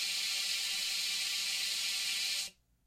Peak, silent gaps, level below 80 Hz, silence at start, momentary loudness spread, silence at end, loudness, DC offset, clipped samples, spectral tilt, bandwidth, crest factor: -22 dBFS; none; -74 dBFS; 0 s; 2 LU; 0.35 s; -32 LUFS; under 0.1%; under 0.1%; 3.5 dB/octave; 16 kHz; 14 dB